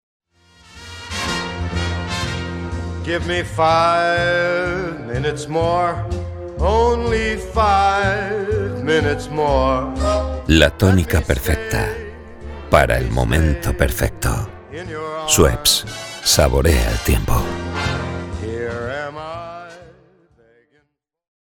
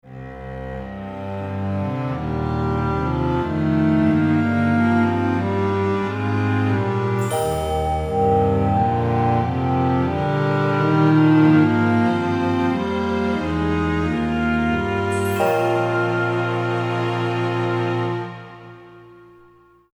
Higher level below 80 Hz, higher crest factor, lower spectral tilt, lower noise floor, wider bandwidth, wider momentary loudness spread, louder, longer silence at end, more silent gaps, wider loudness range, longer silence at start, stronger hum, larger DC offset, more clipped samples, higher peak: first, -28 dBFS vs -38 dBFS; about the same, 18 dB vs 14 dB; second, -4.5 dB/octave vs -7.5 dB/octave; first, -67 dBFS vs -52 dBFS; about the same, over 20 kHz vs over 20 kHz; first, 14 LU vs 8 LU; about the same, -18 LUFS vs -20 LUFS; first, 1.55 s vs 0.8 s; neither; about the same, 7 LU vs 6 LU; first, 0.75 s vs 0.05 s; neither; neither; neither; first, 0 dBFS vs -6 dBFS